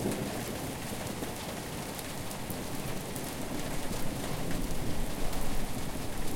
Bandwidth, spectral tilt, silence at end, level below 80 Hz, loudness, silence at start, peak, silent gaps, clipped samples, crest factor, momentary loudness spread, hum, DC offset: 17 kHz; -4.5 dB/octave; 0 s; -40 dBFS; -37 LUFS; 0 s; -16 dBFS; none; under 0.1%; 16 dB; 2 LU; none; under 0.1%